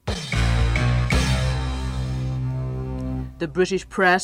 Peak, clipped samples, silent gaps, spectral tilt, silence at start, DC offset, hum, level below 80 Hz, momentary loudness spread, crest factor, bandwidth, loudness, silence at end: -6 dBFS; under 0.1%; none; -5.5 dB/octave; 0.05 s; under 0.1%; none; -28 dBFS; 8 LU; 16 dB; 12 kHz; -23 LUFS; 0 s